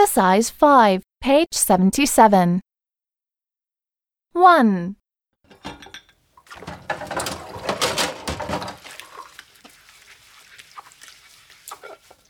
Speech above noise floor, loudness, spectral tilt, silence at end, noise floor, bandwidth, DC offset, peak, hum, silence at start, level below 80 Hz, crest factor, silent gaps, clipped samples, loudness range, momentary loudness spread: over 74 dB; -18 LUFS; -4 dB/octave; 0.35 s; under -90 dBFS; 19.5 kHz; under 0.1%; -2 dBFS; none; 0 s; -50 dBFS; 20 dB; none; under 0.1%; 15 LU; 25 LU